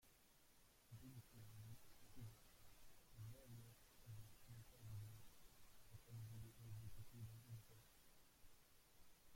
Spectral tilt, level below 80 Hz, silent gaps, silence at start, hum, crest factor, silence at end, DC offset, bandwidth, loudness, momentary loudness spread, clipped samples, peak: -5 dB/octave; -72 dBFS; none; 0 s; none; 16 dB; 0 s; under 0.1%; 16.5 kHz; -62 LUFS; 10 LU; under 0.1%; -44 dBFS